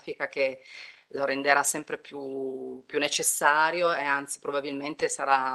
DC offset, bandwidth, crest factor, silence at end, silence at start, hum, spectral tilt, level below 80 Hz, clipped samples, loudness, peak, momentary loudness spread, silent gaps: under 0.1%; 12.5 kHz; 22 dB; 0 s; 0.05 s; none; -1.5 dB/octave; -76 dBFS; under 0.1%; -27 LUFS; -6 dBFS; 15 LU; none